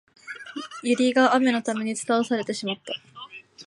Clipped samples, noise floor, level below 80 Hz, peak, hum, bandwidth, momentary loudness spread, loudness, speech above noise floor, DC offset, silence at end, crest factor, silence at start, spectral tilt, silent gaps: under 0.1%; -44 dBFS; -78 dBFS; -6 dBFS; none; 11.5 kHz; 21 LU; -23 LUFS; 21 dB; under 0.1%; 0.05 s; 18 dB; 0.25 s; -3.5 dB/octave; none